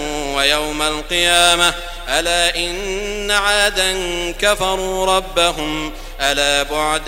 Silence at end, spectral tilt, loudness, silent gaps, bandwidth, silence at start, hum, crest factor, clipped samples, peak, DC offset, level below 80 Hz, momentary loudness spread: 0 s; -1.5 dB/octave; -16 LUFS; none; 16.5 kHz; 0 s; none; 18 dB; under 0.1%; 0 dBFS; 0.1%; -32 dBFS; 10 LU